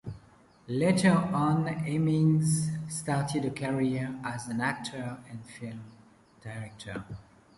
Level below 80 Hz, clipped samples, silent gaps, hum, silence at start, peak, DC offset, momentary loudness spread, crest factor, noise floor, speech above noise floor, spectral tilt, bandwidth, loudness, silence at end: -60 dBFS; under 0.1%; none; none; 0.05 s; -12 dBFS; under 0.1%; 19 LU; 18 dB; -58 dBFS; 29 dB; -6 dB/octave; 11.5 kHz; -29 LUFS; 0.35 s